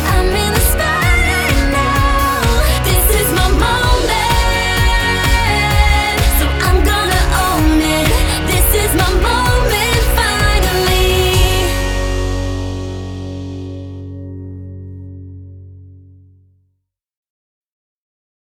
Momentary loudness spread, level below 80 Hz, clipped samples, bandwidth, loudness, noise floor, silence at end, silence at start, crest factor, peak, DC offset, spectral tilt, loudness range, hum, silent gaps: 16 LU; -18 dBFS; under 0.1%; 19.5 kHz; -13 LUFS; -69 dBFS; 2.55 s; 0 s; 14 dB; 0 dBFS; under 0.1%; -4 dB/octave; 16 LU; none; none